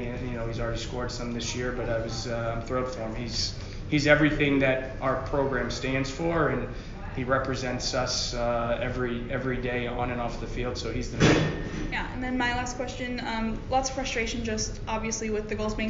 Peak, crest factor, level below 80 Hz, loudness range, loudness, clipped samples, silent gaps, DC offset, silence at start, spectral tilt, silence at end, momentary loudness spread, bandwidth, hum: -6 dBFS; 22 dB; -38 dBFS; 4 LU; -28 LUFS; under 0.1%; none; under 0.1%; 0 s; -4 dB/octave; 0 s; 10 LU; 7.4 kHz; none